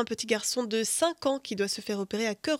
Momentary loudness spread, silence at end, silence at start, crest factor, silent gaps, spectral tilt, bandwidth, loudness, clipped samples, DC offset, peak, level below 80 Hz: 4 LU; 0 s; 0 s; 18 dB; none; -2.5 dB/octave; 17 kHz; -29 LUFS; under 0.1%; under 0.1%; -12 dBFS; -70 dBFS